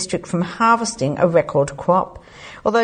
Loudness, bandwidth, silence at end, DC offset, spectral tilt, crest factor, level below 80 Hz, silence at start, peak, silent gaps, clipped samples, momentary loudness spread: -18 LUFS; 9.8 kHz; 0 s; under 0.1%; -5.5 dB/octave; 16 dB; -50 dBFS; 0 s; -2 dBFS; none; under 0.1%; 12 LU